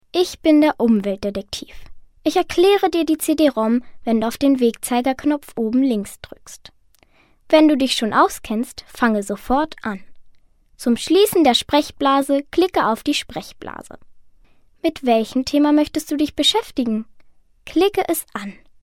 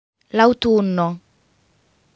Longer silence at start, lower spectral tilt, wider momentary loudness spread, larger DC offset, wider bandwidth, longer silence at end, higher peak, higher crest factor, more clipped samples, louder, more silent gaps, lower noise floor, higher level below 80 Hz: second, 0.15 s vs 0.35 s; second, -4 dB/octave vs -7 dB/octave; first, 15 LU vs 10 LU; neither; first, 16.5 kHz vs 7.8 kHz; second, 0.3 s vs 1 s; about the same, 0 dBFS vs 0 dBFS; about the same, 20 dB vs 20 dB; neither; about the same, -18 LUFS vs -18 LUFS; neither; second, -55 dBFS vs -61 dBFS; about the same, -48 dBFS vs -52 dBFS